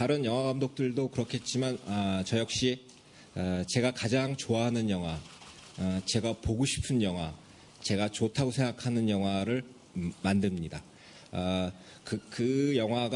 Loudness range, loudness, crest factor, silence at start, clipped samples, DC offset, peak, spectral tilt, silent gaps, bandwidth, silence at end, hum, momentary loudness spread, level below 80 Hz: 2 LU; -31 LUFS; 18 dB; 0 s; under 0.1%; under 0.1%; -14 dBFS; -5.5 dB/octave; none; 11 kHz; 0 s; none; 11 LU; -56 dBFS